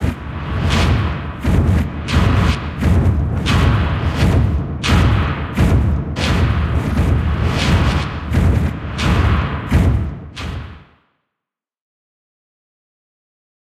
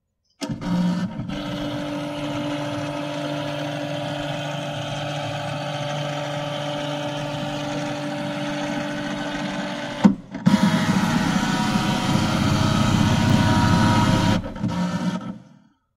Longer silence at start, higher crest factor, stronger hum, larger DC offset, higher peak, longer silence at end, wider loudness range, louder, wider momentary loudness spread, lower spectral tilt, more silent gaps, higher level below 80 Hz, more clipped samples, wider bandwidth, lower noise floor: second, 0 s vs 0.4 s; second, 14 dB vs 22 dB; neither; neither; about the same, -2 dBFS vs -2 dBFS; first, 2.9 s vs 0.5 s; about the same, 7 LU vs 8 LU; first, -17 LUFS vs -23 LUFS; second, 7 LU vs 10 LU; about the same, -6.5 dB/octave vs -5.5 dB/octave; neither; first, -22 dBFS vs -42 dBFS; neither; second, 13.5 kHz vs 16 kHz; first, -84 dBFS vs -54 dBFS